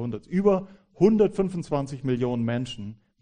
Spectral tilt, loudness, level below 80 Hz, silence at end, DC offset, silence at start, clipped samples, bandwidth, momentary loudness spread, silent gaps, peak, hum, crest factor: -8 dB/octave; -25 LUFS; -52 dBFS; 0.25 s; under 0.1%; 0 s; under 0.1%; 10 kHz; 11 LU; none; -6 dBFS; none; 18 dB